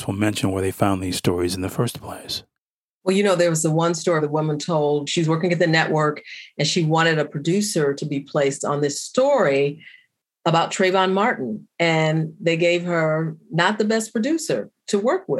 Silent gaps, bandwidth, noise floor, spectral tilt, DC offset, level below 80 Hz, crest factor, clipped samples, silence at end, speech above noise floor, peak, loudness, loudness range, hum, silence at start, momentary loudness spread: 2.61-3.01 s; 16 kHz; -87 dBFS; -5 dB/octave; under 0.1%; -60 dBFS; 18 dB; under 0.1%; 0 s; 66 dB; -2 dBFS; -21 LUFS; 2 LU; none; 0 s; 8 LU